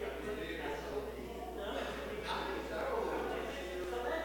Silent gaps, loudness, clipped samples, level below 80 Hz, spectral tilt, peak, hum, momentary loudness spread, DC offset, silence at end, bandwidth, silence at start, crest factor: none; -40 LUFS; under 0.1%; -52 dBFS; -4.5 dB/octave; -26 dBFS; none; 5 LU; under 0.1%; 0 s; 18 kHz; 0 s; 14 dB